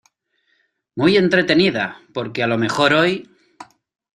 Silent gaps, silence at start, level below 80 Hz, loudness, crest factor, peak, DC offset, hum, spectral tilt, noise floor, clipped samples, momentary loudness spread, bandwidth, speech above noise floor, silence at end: none; 0.95 s; -58 dBFS; -17 LUFS; 18 dB; -2 dBFS; under 0.1%; none; -5.5 dB/octave; -66 dBFS; under 0.1%; 13 LU; 11 kHz; 49 dB; 0.5 s